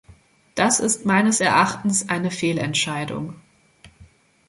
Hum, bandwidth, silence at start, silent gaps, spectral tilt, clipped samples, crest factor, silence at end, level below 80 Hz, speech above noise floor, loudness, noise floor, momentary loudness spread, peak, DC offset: none; 11.5 kHz; 0.55 s; none; -3.5 dB/octave; under 0.1%; 20 dB; 0.45 s; -58 dBFS; 31 dB; -20 LUFS; -52 dBFS; 12 LU; -4 dBFS; under 0.1%